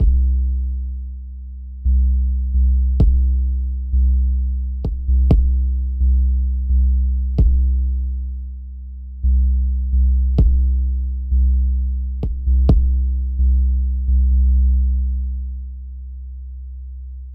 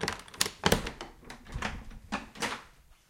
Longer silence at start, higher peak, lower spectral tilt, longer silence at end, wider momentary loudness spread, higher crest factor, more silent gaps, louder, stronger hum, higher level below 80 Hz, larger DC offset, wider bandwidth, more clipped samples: about the same, 0 s vs 0 s; about the same, -4 dBFS vs -6 dBFS; first, -12 dB/octave vs -3 dB/octave; second, 0 s vs 0.15 s; about the same, 17 LU vs 17 LU; second, 12 dB vs 28 dB; neither; first, -19 LUFS vs -33 LUFS; neither; first, -16 dBFS vs -48 dBFS; first, 0.1% vs under 0.1%; second, 1.1 kHz vs 17 kHz; neither